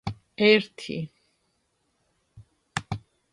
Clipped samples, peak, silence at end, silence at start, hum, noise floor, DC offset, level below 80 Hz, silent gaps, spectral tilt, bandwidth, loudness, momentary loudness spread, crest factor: under 0.1%; -6 dBFS; 0.35 s; 0.05 s; none; -73 dBFS; under 0.1%; -58 dBFS; none; -5 dB/octave; 11 kHz; -25 LUFS; 18 LU; 22 dB